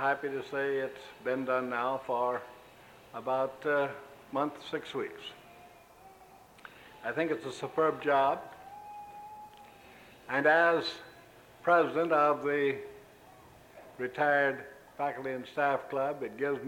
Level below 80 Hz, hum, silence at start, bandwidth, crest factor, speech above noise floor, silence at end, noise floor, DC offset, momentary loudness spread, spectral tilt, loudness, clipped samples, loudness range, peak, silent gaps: -72 dBFS; none; 0 s; 17 kHz; 20 dB; 26 dB; 0 s; -56 dBFS; under 0.1%; 22 LU; -5.5 dB/octave; -31 LUFS; under 0.1%; 8 LU; -12 dBFS; none